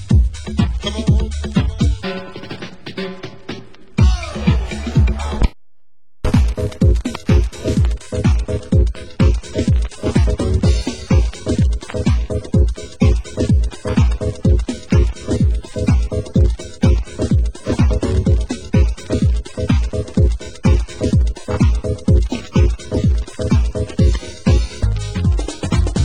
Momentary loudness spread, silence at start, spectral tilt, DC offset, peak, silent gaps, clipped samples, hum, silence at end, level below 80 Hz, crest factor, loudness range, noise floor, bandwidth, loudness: 5 LU; 0 s; -7 dB/octave; 2%; 0 dBFS; none; under 0.1%; none; 0 s; -18 dBFS; 16 dB; 3 LU; -74 dBFS; 10 kHz; -18 LUFS